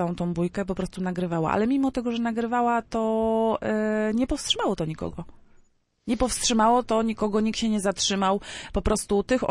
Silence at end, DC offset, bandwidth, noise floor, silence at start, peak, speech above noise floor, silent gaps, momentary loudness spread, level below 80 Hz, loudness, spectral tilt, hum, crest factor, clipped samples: 0 s; under 0.1%; 11.5 kHz; -60 dBFS; 0 s; -8 dBFS; 36 dB; none; 7 LU; -42 dBFS; -25 LUFS; -4.5 dB/octave; none; 16 dB; under 0.1%